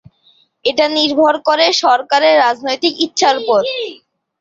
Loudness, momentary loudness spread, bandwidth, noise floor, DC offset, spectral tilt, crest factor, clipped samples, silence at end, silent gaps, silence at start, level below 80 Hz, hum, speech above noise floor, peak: -13 LUFS; 8 LU; 7.8 kHz; -54 dBFS; under 0.1%; -1.5 dB/octave; 14 dB; under 0.1%; 0.45 s; none; 0.65 s; -62 dBFS; none; 41 dB; 0 dBFS